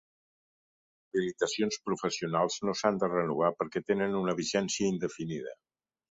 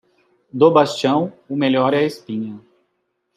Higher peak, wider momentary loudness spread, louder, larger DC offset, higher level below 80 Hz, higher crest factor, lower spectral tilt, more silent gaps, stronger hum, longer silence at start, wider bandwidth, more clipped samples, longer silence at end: second, -12 dBFS vs -2 dBFS; second, 6 LU vs 14 LU; second, -31 LUFS vs -18 LUFS; neither; about the same, -68 dBFS vs -68 dBFS; about the same, 20 dB vs 18 dB; second, -4.5 dB/octave vs -6 dB/octave; neither; neither; first, 1.15 s vs 0.55 s; second, 8 kHz vs 13 kHz; neither; second, 0.6 s vs 0.8 s